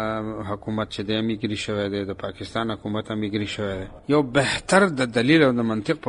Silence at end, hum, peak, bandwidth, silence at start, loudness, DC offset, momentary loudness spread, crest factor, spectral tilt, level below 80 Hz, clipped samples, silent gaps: 0 s; none; -2 dBFS; 11 kHz; 0 s; -23 LUFS; under 0.1%; 11 LU; 22 dB; -5.5 dB/octave; -50 dBFS; under 0.1%; none